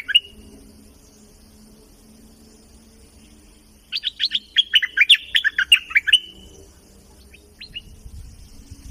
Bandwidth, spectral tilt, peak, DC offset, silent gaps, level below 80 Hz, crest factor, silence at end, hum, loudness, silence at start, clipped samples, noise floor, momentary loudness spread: 15.5 kHz; 1 dB/octave; -4 dBFS; under 0.1%; none; -50 dBFS; 20 dB; 0 s; none; -16 LUFS; 0.1 s; under 0.1%; -50 dBFS; 23 LU